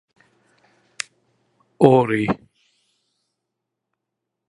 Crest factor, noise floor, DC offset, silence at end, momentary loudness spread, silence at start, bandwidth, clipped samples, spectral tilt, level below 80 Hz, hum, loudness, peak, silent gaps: 24 dB; -81 dBFS; under 0.1%; 2.15 s; 18 LU; 1.8 s; 11.5 kHz; under 0.1%; -6.5 dB/octave; -58 dBFS; none; -19 LUFS; 0 dBFS; none